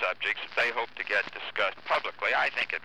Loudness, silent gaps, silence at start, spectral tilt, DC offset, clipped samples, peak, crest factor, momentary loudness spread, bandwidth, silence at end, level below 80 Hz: -28 LUFS; none; 0 s; -2 dB/octave; 0.3%; under 0.1%; -14 dBFS; 16 dB; 4 LU; 14.5 kHz; 0.05 s; -74 dBFS